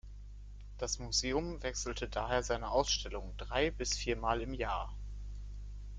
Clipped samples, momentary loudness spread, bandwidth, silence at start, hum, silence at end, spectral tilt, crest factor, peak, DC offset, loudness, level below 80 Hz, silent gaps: under 0.1%; 16 LU; 9.4 kHz; 0.05 s; 50 Hz at -45 dBFS; 0 s; -3 dB/octave; 20 dB; -16 dBFS; under 0.1%; -36 LUFS; -44 dBFS; none